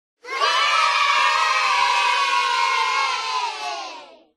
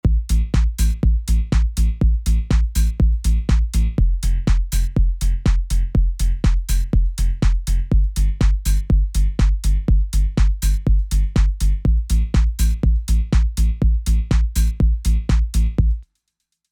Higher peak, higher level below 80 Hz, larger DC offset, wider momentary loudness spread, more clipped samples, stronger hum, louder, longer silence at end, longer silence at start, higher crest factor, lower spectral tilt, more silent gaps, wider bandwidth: about the same, -6 dBFS vs -4 dBFS; second, -68 dBFS vs -16 dBFS; neither; first, 12 LU vs 2 LU; neither; neither; about the same, -19 LUFS vs -20 LUFS; second, 0.3 s vs 0.7 s; first, 0.25 s vs 0.05 s; about the same, 16 dB vs 12 dB; second, 2.5 dB/octave vs -6 dB/octave; neither; second, 13.5 kHz vs 15 kHz